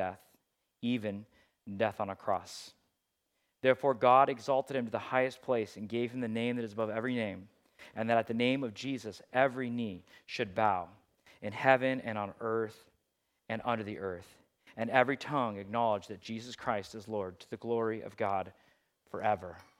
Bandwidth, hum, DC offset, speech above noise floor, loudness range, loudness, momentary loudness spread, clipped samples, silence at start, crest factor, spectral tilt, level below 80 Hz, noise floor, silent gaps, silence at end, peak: 15 kHz; none; under 0.1%; 49 dB; 6 LU; -33 LUFS; 14 LU; under 0.1%; 0 s; 26 dB; -6 dB/octave; -78 dBFS; -82 dBFS; none; 0.2 s; -8 dBFS